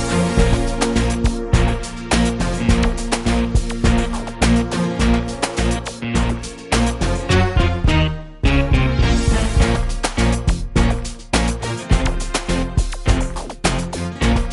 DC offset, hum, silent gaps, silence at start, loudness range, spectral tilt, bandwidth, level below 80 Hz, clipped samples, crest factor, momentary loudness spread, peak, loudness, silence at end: under 0.1%; none; none; 0 s; 3 LU; -5.5 dB/octave; 11.5 kHz; -20 dBFS; under 0.1%; 16 dB; 5 LU; -2 dBFS; -19 LUFS; 0 s